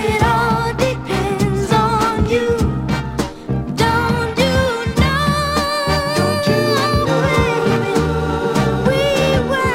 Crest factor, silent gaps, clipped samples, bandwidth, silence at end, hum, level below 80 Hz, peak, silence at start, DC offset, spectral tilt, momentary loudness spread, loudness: 14 dB; none; under 0.1%; 16.5 kHz; 0 s; none; -30 dBFS; -2 dBFS; 0 s; under 0.1%; -5.5 dB/octave; 4 LU; -16 LUFS